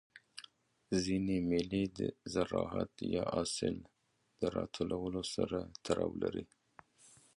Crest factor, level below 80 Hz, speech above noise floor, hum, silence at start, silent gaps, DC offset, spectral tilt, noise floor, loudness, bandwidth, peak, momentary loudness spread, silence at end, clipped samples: 20 dB; -60 dBFS; 28 dB; none; 0.15 s; none; under 0.1%; -5.5 dB/octave; -64 dBFS; -37 LUFS; 11.5 kHz; -18 dBFS; 12 LU; 0.3 s; under 0.1%